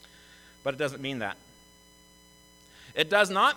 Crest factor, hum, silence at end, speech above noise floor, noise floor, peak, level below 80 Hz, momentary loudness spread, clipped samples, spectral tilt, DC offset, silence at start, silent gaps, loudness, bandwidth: 24 dB; none; 0 s; 30 dB; -57 dBFS; -6 dBFS; -66 dBFS; 14 LU; under 0.1%; -3.5 dB/octave; under 0.1%; 0.65 s; none; -28 LUFS; 19 kHz